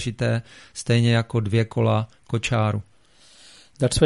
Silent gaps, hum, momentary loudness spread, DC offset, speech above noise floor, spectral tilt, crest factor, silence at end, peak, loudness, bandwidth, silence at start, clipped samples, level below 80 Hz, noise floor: none; none; 9 LU; 0.1%; 33 dB; -6 dB/octave; 18 dB; 0 s; -4 dBFS; -23 LUFS; 11.5 kHz; 0 s; under 0.1%; -44 dBFS; -55 dBFS